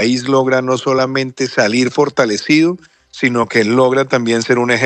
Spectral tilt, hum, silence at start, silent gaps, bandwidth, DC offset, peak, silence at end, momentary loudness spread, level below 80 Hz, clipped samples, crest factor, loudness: -5 dB/octave; none; 0 s; none; 9.4 kHz; under 0.1%; 0 dBFS; 0 s; 5 LU; -60 dBFS; under 0.1%; 14 dB; -14 LUFS